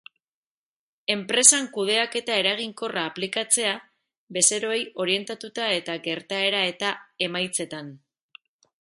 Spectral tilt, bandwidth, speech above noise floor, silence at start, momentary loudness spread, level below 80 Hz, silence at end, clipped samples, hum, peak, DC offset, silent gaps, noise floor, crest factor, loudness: -1 dB/octave; 12 kHz; over 65 dB; 1.1 s; 12 LU; -76 dBFS; 0.85 s; under 0.1%; none; 0 dBFS; under 0.1%; 4.17-4.28 s; under -90 dBFS; 26 dB; -23 LUFS